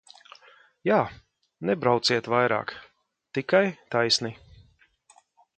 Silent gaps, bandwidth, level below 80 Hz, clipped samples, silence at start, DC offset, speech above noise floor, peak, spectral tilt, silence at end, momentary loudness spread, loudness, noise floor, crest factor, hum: none; 9.2 kHz; -64 dBFS; under 0.1%; 0.85 s; under 0.1%; 36 dB; -6 dBFS; -4 dB/octave; 1.25 s; 11 LU; -25 LUFS; -61 dBFS; 22 dB; none